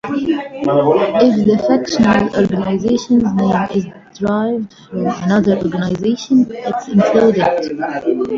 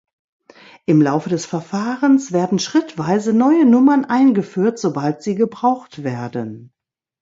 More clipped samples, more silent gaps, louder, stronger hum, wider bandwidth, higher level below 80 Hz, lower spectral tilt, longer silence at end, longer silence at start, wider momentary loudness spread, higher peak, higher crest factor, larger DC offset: neither; neither; about the same, -15 LUFS vs -17 LUFS; neither; about the same, 7.6 kHz vs 7.8 kHz; first, -46 dBFS vs -64 dBFS; about the same, -7 dB/octave vs -6.5 dB/octave; second, 0 s vs 0.55 s; second, 0.05 s vs 0.9 s; second, 9 LU vs 13 LU; first, 0 dBFS vs -4 dBFS; about the same, 14 dB vs 14 dB; neither